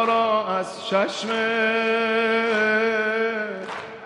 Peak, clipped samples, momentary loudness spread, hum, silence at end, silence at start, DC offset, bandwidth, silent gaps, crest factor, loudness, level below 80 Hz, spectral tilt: -8 dBFS; under 0.1%; 7 LU; none; 0 s; 0 s; under 0.1%; 11 kHz; none; 16 dB; -22 LUFS; -72 dBFS; -4 dB/octave